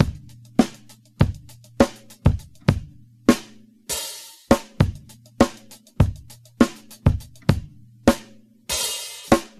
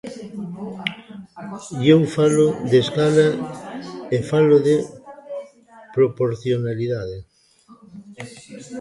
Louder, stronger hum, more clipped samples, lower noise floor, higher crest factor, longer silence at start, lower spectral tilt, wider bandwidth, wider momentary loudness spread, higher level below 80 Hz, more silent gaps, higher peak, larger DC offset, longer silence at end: second, -23 LUFS vs -19 LUFS; neither; neither; about the same, -48 dBFS vs -51 dBFS; about the same, 22 dB vs 20 dB; about the same, 0 s vs 0.05 s; about the same, -5.5 dB/octave vs -6.5 dB/octave; first, 15 kHz vs 11.5 kHz; second, 11 LU vs 22 LU; first, -36 dBFS vs -56 dBFS; neither; about the same, 0 dBFS vs -2 dBFS; neither; first, 0.15 s vs 0 s